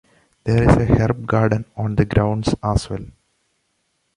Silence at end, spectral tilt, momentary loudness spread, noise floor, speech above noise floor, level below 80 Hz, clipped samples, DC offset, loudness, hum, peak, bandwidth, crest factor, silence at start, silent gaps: 1.05 s; -7.5 dB/octave; 10 LU; -69 dBFS; 51 dB; -32 dBFS; under 0.1%; under 0.1%; -19 LUFS; none; -2 dBFS; 11 kHz; 18 dB; 0.45 s; none